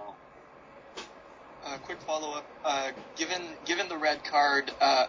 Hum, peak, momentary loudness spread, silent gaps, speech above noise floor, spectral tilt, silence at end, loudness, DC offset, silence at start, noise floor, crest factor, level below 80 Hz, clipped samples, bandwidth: none; -12 dBFS; 21 LU; none; 23 dB; -1.5 dB/octave; 0 s; -30 LUFS; under 0.1%; 0 s; -53 dBFS; 20 dB; -70 dBFS; under 0.1%; 7.6 kHz